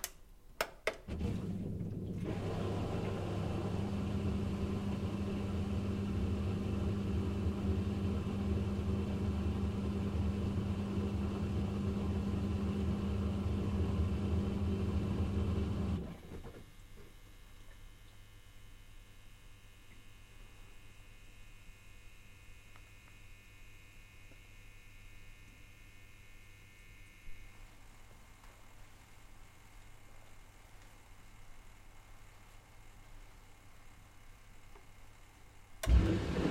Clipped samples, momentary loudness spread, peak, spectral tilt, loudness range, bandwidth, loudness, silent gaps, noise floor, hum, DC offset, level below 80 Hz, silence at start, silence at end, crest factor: under 0.1%; 24 LU; -16 dBFS; -7 dB/octave; 23 LU; 16 kHz; -37 LUFS; none; -57 dBFS; none; under 0.1%; -46 dBFS; 0 s; 0 s; 22 dB